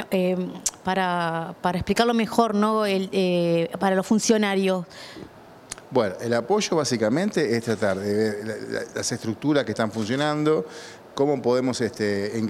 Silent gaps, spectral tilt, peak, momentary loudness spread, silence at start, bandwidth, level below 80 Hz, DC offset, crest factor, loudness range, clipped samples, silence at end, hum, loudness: none; -5 dB/octave; -4 dBFS; 9 LU; 0 s; 15 kHz; -58 dBFS; under 0.1%; 20 dB; 3 LU; under 0.1%; 0 s; none; -24 LUFS